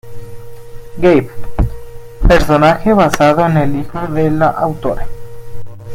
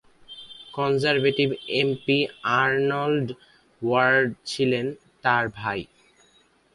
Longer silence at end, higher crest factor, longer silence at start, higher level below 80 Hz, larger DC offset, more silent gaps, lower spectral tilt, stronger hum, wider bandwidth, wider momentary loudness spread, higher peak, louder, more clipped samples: second, 0 s vs 0.9 s; second, 14 dB vs 20 dB; second, 0.05 s vs 0.3 s; first, -24 dBFS vs -62 dBFS; neither; neither; first, -7 dB/octave vs -5.5 dB/octave; neither; first, 16 kHz vs 11.5 kHz; first, 24 LU vs 14 LU; first, 0 dBFS vs -6 dBFS; first, -13 LUFS vs -23 LUFS; neither